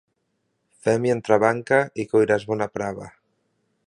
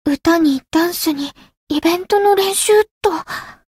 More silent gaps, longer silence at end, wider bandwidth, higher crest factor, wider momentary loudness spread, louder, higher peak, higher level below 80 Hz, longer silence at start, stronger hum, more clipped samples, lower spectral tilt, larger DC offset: second, none vs 1.57-1.67 s, 2.91-3.01 s; first, 0.8 s vs 0.25 s; second, 11 kHz vs 16.5 kHz; first, 22 dB vs 14 dB; about the same, 10 LU vs 11 LU; second, -22 LUFS vs -16 LUFS; about the same, -2 dBFS vs -4 dBFS; second, -62 dBFS vs -50 dBFS; first, 0.85 s vs 0.05 s; neither; neither; first, -6.5 dB/octave vs -2.5 dB/octave; neither